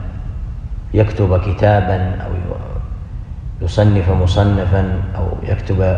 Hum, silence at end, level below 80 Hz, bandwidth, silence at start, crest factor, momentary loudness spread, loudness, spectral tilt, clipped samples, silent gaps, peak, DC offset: none; 0 s; -24 dBFS; 7.4 kHz; 0 s; 16 dB; 15 LU; -17 LUFS; -8.5 dB/octave; under 0.1%; none; 0 dBFS; under 0.1%